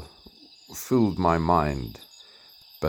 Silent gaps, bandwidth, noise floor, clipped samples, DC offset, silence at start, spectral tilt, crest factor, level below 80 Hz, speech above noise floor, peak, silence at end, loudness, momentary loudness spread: none; 19.5 kHz; -52 dBFS; under 0.1%; under 0.1%; 0 s; -6.5 dB/octave; 20 dB; -46 dBFS; 28 dB; -6 dBFS; 0 s; -24 LUFS; 24 LU